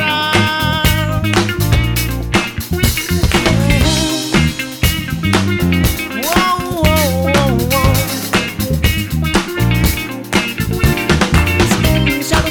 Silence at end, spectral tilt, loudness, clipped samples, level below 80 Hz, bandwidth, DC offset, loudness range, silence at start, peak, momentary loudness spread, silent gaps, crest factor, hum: 0 s; -4.5 dB/octave; -14 LUFS; under 0.1%; -22 dBFS; over 20 kHz; under 0.1%; 1 LU; 0 s; 0 dBFS; 4 LU; none; 14 dB; none